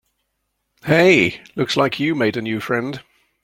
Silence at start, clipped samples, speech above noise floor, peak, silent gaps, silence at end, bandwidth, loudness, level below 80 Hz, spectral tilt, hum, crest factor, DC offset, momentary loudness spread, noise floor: 0.85 s; under 0.1%; 55 dB; -2 dBFS; none; 0.45 s; 16 kHz; -18 LUFS; -56 dBFS; -5.5 dB/octave; none; 18 dB; under 0.1%; 15 LU; -73 dBFS